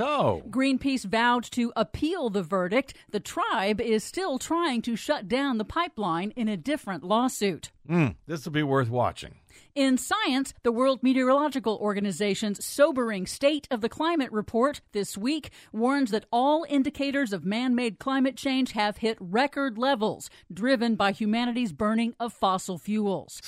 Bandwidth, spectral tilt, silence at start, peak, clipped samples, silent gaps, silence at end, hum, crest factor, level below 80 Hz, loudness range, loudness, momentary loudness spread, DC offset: 15.5 kHz; -5 dB/octave; 0 s; -8 dBFS; under 0.1%; none; 0 s; none; 18 dB; -56 dBFS; 2 LU; -27 LUFS; 7 LU; under 0.1%